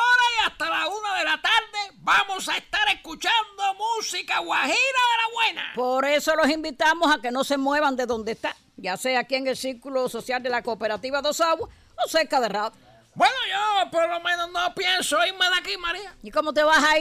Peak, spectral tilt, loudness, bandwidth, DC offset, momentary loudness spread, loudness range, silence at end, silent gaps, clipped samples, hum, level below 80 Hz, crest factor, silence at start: -8 dBFS; -1.5 dB/octave; -23 LUFS; 15.5 kHz; under 0.1%; 8 LU; 4 LU; 0 s; none; under 0.1%; none; -58 dBFS; 16 dB; 0 s